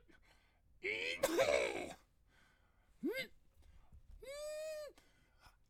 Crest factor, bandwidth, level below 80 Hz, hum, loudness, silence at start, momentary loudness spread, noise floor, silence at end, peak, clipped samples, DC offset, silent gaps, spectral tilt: 22 dB; 17.5 kHz; -68 dBFS; none; -40 LUFS; 0.15 s; 18 LU; -71 dBFS; 0.2 s; -20 dBFS; under 0.1%; under 0.1%; none; -2.5 dB/octave